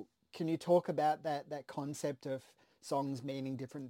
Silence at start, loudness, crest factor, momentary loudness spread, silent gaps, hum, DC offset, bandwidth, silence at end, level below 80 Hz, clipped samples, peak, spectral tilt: 0 s; -37 LUFS; 20 dB; 12 LU; none; none; under 0.1%; 16.5 kHz; 0 s; -84 dBFS; under 0.1%; -18 dBFS; -6 dB/octave